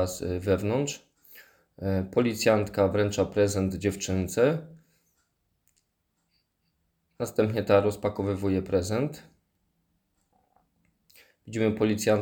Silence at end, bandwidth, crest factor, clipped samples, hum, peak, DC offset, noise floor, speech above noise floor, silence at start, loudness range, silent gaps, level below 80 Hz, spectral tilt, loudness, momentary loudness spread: 0 s; over 20 kHz; 20 dB; under 0.1%; none; -8 dBFS; under 0.1%; -76 dBFS; 51 dB; 0 s; 7 LU; none; -58 dBFS; -6 dB/octave; -27 LUFS; 10 LU